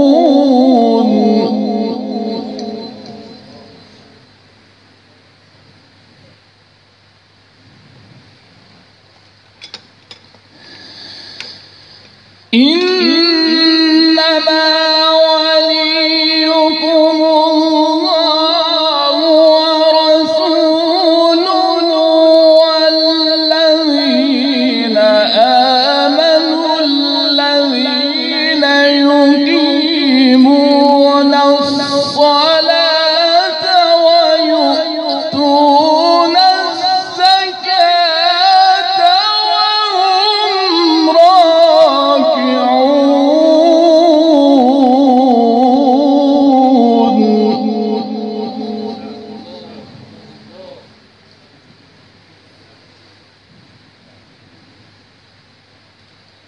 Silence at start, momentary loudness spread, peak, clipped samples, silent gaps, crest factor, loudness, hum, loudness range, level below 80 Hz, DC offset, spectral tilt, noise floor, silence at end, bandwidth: 0 s; 8 LU; 0 dBFS; 0.1%; none; 12 dB; -10 LUFS; none; 7 LU; -64 dBFS; under 0.1%; -4 dB/octave; -48 dBFS; 5.8 s; 10.5 kHz